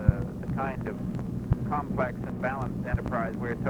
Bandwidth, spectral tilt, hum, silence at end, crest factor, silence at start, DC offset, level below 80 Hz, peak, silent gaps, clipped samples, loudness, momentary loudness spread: 11.5 kHz; -9.5 dB/octave; none; 0 s; 24 dB; 0 s; under 0.1%; -38 dBFS; -6 dBFS; none; under 0.1%; -31 LUFS; 5 LU